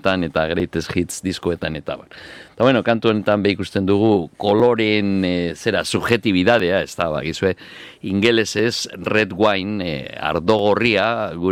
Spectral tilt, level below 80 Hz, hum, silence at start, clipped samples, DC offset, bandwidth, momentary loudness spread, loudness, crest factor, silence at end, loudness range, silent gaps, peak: -5 dB/octave; -48 dBFS; none; 0.05 s; under 0.1%; under 0.1%; 15.5 kHz; 9 LU; -19 LUFS; 18 dB; 0 s; 3 LU; none; -2 dBFS